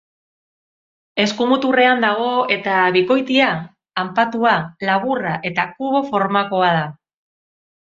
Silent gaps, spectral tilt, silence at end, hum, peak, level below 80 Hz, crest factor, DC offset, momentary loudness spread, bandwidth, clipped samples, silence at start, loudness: none; -5.5 dB/octave; 0.95 s; none; -2 dBFS; -62 dBFS; 18 dB; under 0.1%; 7 LU; 7.8 kHz; under 0.1%; 1.15 s; -17 LUFS